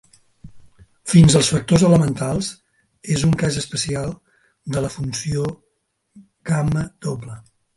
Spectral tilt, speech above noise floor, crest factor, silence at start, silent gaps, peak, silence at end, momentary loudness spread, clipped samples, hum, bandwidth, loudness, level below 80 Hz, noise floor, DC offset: -5.5 dB/octave; 53 dB; 20 dB; 0.45 s; none; 0 dBFS; 0.35 s; 21 LU; under 0.1%; none; 11.5 kHz; -19 LUFS; -42 dBFS; -71 dBFS; under 0.1%